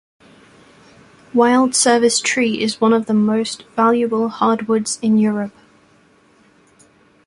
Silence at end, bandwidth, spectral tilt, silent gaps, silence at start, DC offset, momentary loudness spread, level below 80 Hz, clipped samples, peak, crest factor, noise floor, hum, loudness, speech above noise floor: 1.75 s; 11.5 kHz; -3.5 dB/octave; none; 1.35 s; under 0.1%; 7 LU; -62 dBFS; under 0.1%; -2 dBFS; 16 dB; -53 dBFS; none; -16 LUFS; 37 dB